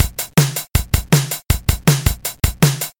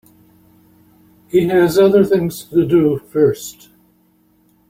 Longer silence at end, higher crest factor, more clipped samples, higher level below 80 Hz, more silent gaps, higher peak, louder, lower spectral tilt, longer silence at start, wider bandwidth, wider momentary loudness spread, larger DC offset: second, 0.1 s vs 1.2 s; about the same, 16 dB vs 16 dB; neither; first, -26 dBFS vs -52 dBFS; neither; about the same, 0 dBFS vs -2 dBFS; about the same, -17 LUFS vs -15 LUFS; second, -4.5 dB/octave vs -6.5 dB/octave; second, 0 s vs 1.35 s; about the same, 17 kHz vs 16.5 kHz; about the same, 5 LU vs 7 LU; neither